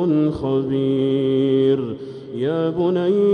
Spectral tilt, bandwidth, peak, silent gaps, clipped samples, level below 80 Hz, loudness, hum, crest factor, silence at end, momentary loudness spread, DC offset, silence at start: -9.5 dB/octave; 5.2 kHz; -8 dBFS; none; under 0.1%; -52 dBFS; -20 LUFS; none; 12 dB; 0 s; 8 LU; under 0.1%; 0 s